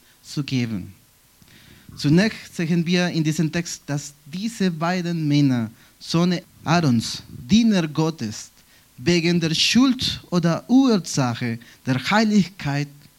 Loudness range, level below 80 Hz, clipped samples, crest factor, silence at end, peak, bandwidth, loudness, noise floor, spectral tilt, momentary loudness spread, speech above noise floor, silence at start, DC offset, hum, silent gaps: 4 LU; -54 dBFS; under 0.1%; 18 dB; 0.3 s; -4 dBFS; 16.5 kHz; -21 LUFS; -54 dBFS; -5 dB/octave; 13 LU; 33 dB; 0.25 s; under 0.1%; none; none